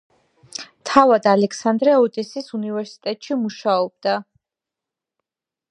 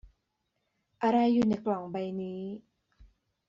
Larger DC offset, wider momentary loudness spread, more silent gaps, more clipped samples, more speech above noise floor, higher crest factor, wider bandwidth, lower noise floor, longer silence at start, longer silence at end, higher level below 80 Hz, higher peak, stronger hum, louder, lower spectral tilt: neither; about the same, 14 LU vs 15 LU; neither; neither; first, 70 dB vs 52 dB; about the same, 20 dB vs 16 dB; first, 10.5 kHz vs 7.4 kHz; first, -88 dBFS vs -80 dBFS; first, 0.6 s vs 0.05 s; first, 1.5 s vs 0.45 s; about the same, -66 dBFS vs -64 dBFS; first, 0 dBFS vs -16 dBFS; neither; first, -19 LUFS vs -30 LUFS; about the same, -5 dB/octave vs -6 dB/octave